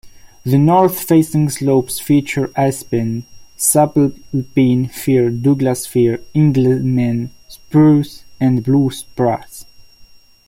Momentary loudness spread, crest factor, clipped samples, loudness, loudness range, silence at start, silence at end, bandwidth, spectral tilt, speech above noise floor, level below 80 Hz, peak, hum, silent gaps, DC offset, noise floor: 8 LU; 16 dB; under 0.1%; -15 LUFS; 1 LU; 0.05 s; 0.45 s; 16.5 kHz; -6.5 dB/octave; 29 dB; -48 dBFS; 0 dBFS; none; none; under 0.1%; -43 dBFS